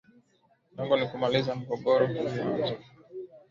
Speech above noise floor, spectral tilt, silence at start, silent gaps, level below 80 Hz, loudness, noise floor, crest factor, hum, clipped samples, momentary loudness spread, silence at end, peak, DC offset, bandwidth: 40 dB; -7 dB/octave; 0.75 s; none; -66 dBFS; -28 LUFS; -68 dBFS; 18 dB; none; under 0.1%; 19 LU; 0.1 s; -12 dBFS; under 0.1%; 7.4 kHz